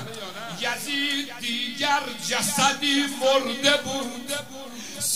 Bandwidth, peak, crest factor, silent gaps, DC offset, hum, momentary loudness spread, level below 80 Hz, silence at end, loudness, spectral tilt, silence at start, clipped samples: 16 kHz; -2 dBFS; 24 dB; none; 0.5%; none; 13 LU; -66 dBFS; 0 s; -24 LUFS; -1.5 dB/octave; 0 s; under 0.1%